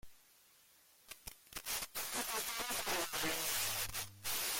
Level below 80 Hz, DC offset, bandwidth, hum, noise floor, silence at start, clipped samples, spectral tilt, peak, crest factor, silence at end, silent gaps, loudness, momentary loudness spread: -64 dBFS; under 0.1%; 17 kHz; none; -67 dBFS; 0.05 s; under 0.1%; -0.5 dB/octave; -26 dBFS; 16 dB; 0 s; none; -38 LUFS; 15 LU